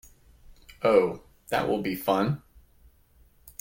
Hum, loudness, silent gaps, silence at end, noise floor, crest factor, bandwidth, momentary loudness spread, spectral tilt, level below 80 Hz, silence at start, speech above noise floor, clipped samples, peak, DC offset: none; -26 LUFS; none; 0.1 s; -60 dBFS; 20 dB; 17 kHz; 14 LU; -6.5 dB/octave; -56 dBFS; 0.8 s; 35 dB; under 0.1%; -8 dBFS; under 0.1%